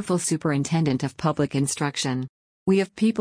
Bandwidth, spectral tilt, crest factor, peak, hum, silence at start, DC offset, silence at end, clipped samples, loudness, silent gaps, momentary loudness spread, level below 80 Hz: 10.5 kHz; -5.5 dB/octave; 14 dB; -8 dBFS; none; 0 s; under 0.1%; 0 s; under 0.1%; -24 LUFS; 2.29-2.66 s; 5 LU; -58 dBFS